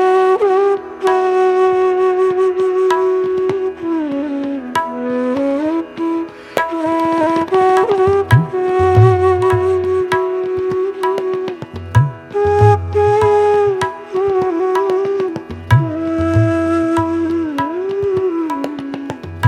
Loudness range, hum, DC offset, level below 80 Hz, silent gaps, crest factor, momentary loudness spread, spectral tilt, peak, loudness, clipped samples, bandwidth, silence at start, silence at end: 5 LU; none; under 0.1%; -42 dBFS; none; 14 dB; 8 LU; -8 dB/octave; 0 dBFS; -15 LUFS; under 0.1%; 11.5 kHz; 0 s; 0 s